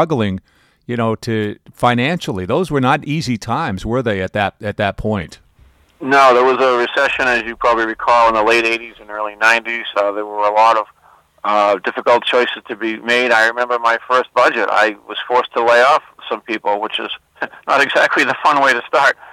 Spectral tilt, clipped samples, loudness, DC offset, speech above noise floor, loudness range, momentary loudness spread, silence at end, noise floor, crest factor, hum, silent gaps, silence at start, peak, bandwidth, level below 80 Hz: -5 dB/octave; under 0.1%; -15 LUFS; under 0.1%; 35 dB; 4 LU; 11 LU; 0.05 s; -50 dBFS; 14 dB; none; none; 0 s; -2 dBFS; 15.5 kHz; -46 dBFS